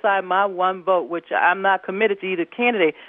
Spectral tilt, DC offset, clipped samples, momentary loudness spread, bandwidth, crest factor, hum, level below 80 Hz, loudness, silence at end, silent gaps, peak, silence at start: -8.5 dB/octave; under 0.1%; under 0.1%; 5 LU; 3.9 kHz; 16 dB; none; -78 dBFS; -20 LUFS; 0 s; none; -6 dBFS; 0.05 s